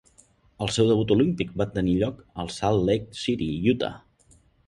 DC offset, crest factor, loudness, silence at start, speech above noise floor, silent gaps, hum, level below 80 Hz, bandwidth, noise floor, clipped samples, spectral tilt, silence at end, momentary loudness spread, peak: under 0.1%; 18 dB; -25 LUFS; 0.6 s; 35 dB; none; none; -48 dBFS; 11.5 kHz; -59 dBFS; under 0.1%; -6 dB/octave; 0.7 s; 9 LU; -8 dBFS